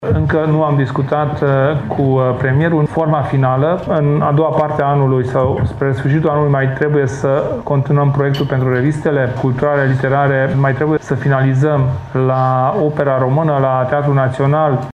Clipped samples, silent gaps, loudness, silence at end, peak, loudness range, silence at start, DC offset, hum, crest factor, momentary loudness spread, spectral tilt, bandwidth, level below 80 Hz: under 0.1%; none; -14 LUFS; 0 s; -2 dBFS; 1 LU; 0 s; under 0.1%; none; 12 dB; 3 LU; -9 dB/octave; 7.6 kHz; -40 dBFS